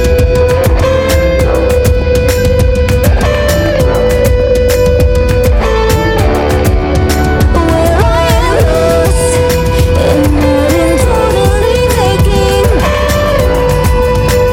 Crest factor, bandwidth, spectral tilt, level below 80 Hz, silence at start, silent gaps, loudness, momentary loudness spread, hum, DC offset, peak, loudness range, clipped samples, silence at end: 8 dB; 17 kHz; -6 dB/octave; -14 dBFS; 0 s; none; -10 LUFS; 1 LU; none; under 0.1%; 0 dBFS; 1 LU; under 0.1%; 0 s